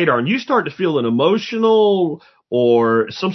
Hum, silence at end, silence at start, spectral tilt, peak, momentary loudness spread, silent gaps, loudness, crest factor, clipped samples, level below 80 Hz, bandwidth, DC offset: none; 0 s; 0 s; -6.5 dB/octave; -2 dBFS; 6 LU; none; -16 LUFS; 14 dB; under 0.1%; -66 dBFS; 6.2 kHz; under 0.1%